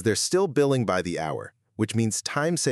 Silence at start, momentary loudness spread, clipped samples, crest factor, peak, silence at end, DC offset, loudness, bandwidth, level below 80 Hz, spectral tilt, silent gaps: 0 s; 9 LU; under 0.1%; 14 dB; -10 dBFS; 0 s; under 0.1%; -25 LUFS; 13.5 kHz; -62 dBFS; -4.5 dB/octave; none